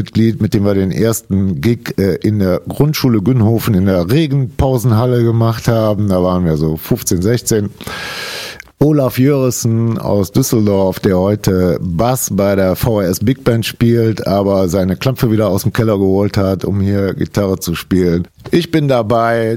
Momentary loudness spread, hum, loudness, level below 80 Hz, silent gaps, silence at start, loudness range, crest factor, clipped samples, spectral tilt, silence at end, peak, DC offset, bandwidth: 4 LU; none; -14 LUFS; -36 dBFS; none; 0 s; 2 LU; 12 dB; under 0.1%; -6.5 dB/octave; 0 s; -2 dBFS; 0.1%; 16.5 kHz